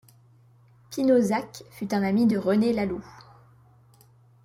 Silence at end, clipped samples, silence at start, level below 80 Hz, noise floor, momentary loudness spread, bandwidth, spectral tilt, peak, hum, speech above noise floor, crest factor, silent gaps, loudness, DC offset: 1.35 s; under 0.1%; 0.9 s; -60 dBFS; -57 dBFS; 15 LU; 16 kHz; -6.5 dB/octave; -10 dBFS; none; 33 dB; 16 dB; none; -24 LUFS; under 0.1%